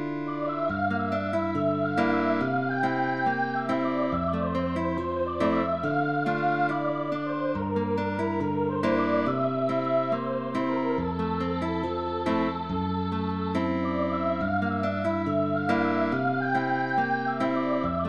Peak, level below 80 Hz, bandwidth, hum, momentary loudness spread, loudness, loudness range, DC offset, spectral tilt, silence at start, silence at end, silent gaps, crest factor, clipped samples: -12 dBFS; -54 dBFS; 8.6 kHz; none; 4 LU; -27 LUFS; 2 LU; 0.3%; -8 dB/octave; 0 s; 0 s; none; 14 dB; under 0.1%